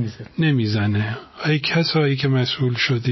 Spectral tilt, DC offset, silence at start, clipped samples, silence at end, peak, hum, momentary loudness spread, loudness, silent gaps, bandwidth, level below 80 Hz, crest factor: -6.5 dB/octave; under 0.1%; 0 s; under 0.1%; 0 s; -8 dBFS; none; 6 LU; -20 LUFS; none; 6.2 kHz; -50 dBFS; 12 dB